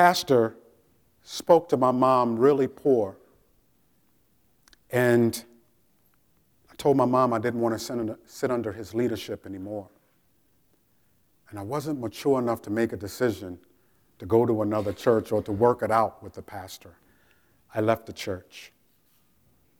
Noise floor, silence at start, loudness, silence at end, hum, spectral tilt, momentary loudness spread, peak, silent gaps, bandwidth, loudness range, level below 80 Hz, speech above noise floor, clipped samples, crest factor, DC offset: -67 dBFS; 0 s; -25 LUFS; 1.15 s; none; -6 dB/octave; 18 LU; -4 dBFS; none; over 20 kHz; 9 LU; -64 dBFS; 43 dB; under 0.1%; 22 dB; under 0.1%